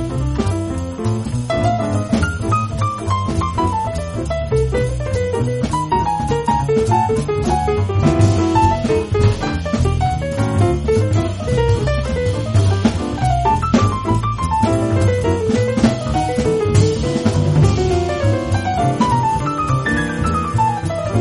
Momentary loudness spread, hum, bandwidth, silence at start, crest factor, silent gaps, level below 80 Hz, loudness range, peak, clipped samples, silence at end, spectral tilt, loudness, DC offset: 5 LU; none; 11.5 kHz; 0 s; 14 dB; none; -28 dBFS; 3 LU; -2 dBFS; under 0.1%; 0 s; -7 dB/octave; -17 LUFS; under 0.1%